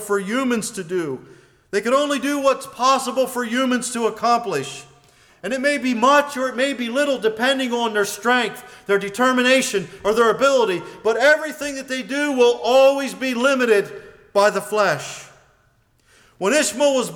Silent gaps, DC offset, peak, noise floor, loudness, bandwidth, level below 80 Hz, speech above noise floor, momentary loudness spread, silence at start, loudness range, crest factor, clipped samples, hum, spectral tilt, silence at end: none; under 0.1%; -6 dBFS; -60 dBFS; -19 LUFS; 19 kHz; -62 dBFS; 41 dB; 11 LU; 0 s; 3 LU; 14 dB; under 0.1%; none; -3 dB/octave; 0 s